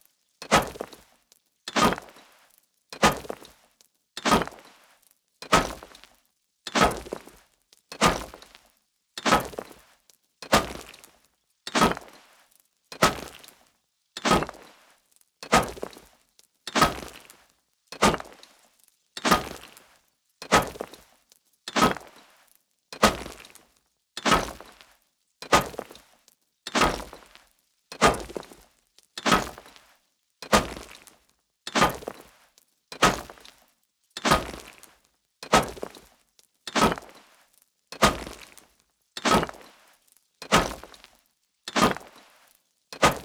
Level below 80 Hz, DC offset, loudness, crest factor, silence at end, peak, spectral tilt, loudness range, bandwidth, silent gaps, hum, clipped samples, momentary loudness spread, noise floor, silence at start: -46 dBFS; under 0.1%; -25 LUFS; 26 dB; 0 s; -4 dBFS; -3.5 dB/octave; 2 LU; over 20 kHz; none; none; under 0.1%; 22 LU; -71 dBFS; 0.4 s